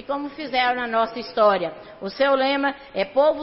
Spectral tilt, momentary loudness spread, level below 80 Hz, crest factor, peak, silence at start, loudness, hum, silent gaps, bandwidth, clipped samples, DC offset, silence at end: -8 dB/octave; 10 LU; -58 dBFS; 16 dB; -6 dBFS; 0 s; -22 LUFS; none; none; 5.8 kHz; under 0.1%; under 0.1%; 0 s